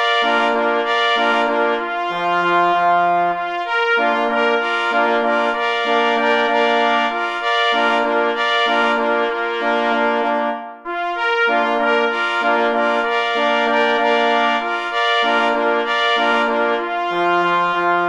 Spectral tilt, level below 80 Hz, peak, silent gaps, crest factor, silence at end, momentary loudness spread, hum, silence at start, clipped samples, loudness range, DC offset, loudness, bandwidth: -3.5 dB/octave; -60 dBFS; -4 dBFS; none; 14 dB; 0 s; 5 LU; none; 0 s; under 0.1%; 2 LU; under 0.1%; -17 LUFS; 10.5 kHz